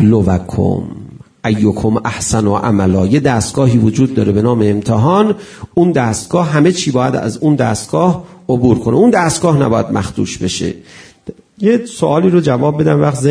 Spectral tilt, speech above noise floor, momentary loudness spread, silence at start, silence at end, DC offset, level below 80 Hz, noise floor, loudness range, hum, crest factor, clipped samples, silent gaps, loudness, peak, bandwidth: -6.5 dB/octave; 21 dB; 9 LU; 0 s; 0 s; under 0.1%; -40 dBFS; -33 dBFS; 2 LU; none; 12 dB; under 0.1%; none; -13 LUFS; 0 dBFS; 11 kHz